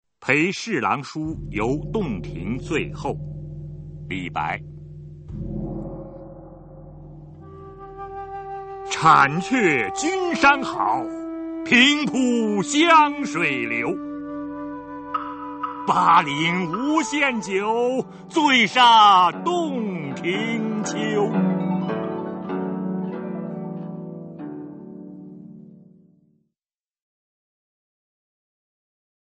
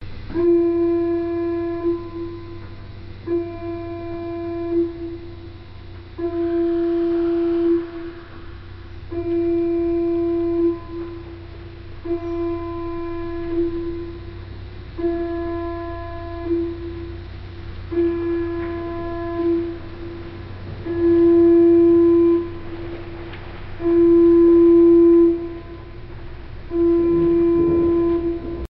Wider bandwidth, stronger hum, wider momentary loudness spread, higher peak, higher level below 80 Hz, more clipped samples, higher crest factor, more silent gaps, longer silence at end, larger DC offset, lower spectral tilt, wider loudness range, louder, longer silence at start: first, 8.8 kHz vs 5 kHz; neither; about the same, 22 LU vs 24 LU; first, -2 dBFS vs -6 dBFS; second, -48 dBFS vs -38 dBFS; neither; first, 20 dB vs 14 dB; neither; first, 3.5 s vs 0.05 s; neither; second, -4.5 dB/octave vs -8 dB/octave; first, 18 LU vs 12 LU; about the same, -21 LUFS vs -19 LUFS; first, 0.2 s vs 0 s